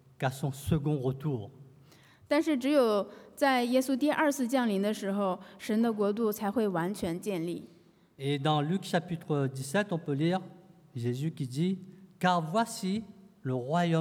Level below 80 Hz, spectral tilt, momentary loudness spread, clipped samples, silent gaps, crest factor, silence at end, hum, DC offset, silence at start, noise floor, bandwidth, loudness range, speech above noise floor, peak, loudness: -64 dBFS; -6 dB/octave; 10 LU; under 0.1%; none; 18 dB; 0 s; none; under 0.1%; 0.2 s; -58 dBFS; 18 kHz; 4 LU; 28 dB; -12 dBFS; -31 LUFS